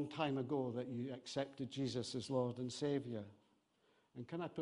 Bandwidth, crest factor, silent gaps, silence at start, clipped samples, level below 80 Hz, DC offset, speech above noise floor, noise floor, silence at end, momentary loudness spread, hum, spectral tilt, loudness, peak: 10.5 kHz; 18 dB; none; 0 s; under 0.1%; -78 dBFS; under 0.1%; 35 dB; -77 dBFS; 0 s; 9 LU; none; -6 dB/octave; -43 LUFS; -24 dBFS